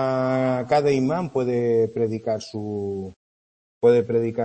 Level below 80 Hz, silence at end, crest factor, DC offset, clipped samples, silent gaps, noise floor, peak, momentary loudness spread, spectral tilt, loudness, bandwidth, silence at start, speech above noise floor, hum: -62 dBFS; 0 s; 16 dB; under 0.1%; under 0.1%; 3.16-3.81 s; under -90 dBFS; -6 dBFS; 10 LU; -7.5 dB/octave; -22 LUFS; 8.6 kHz; 0 s; over 68 dB; none